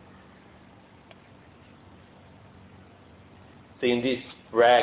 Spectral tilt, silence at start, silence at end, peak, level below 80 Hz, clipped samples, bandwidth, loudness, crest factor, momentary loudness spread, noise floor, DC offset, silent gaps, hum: -8.5 dB/octave; 3.8 s; 0 s; -8 dBFS; -62 dBFS; under 0.1%; 4 kHz; -25 LUFS; 22 dB; 30 LU; -53 dBFS; under 0.1%; none; none